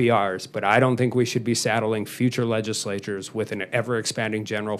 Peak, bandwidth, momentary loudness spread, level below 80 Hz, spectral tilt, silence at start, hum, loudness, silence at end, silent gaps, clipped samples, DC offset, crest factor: -4 dBFS; 14.5 kHz; 9 LU; -68 dBFS; -5 dB/octave; 0 s; none; -24 LUFS; 0 s; none; under 0.1%; under 0.1%; 20 dB